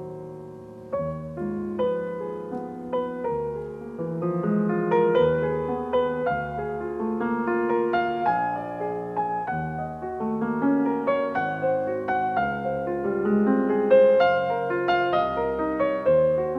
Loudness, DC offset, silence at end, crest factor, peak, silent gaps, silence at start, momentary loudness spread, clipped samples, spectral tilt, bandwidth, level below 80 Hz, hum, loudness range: -25 LUFS; under 0.1%; 0 s; 18 dB; -6 dBFS; none; 0 s; 11 LU; under 0.1%; -8.5 dB/octave; 5.4 kHz; -54 dBFS; none; 8 LU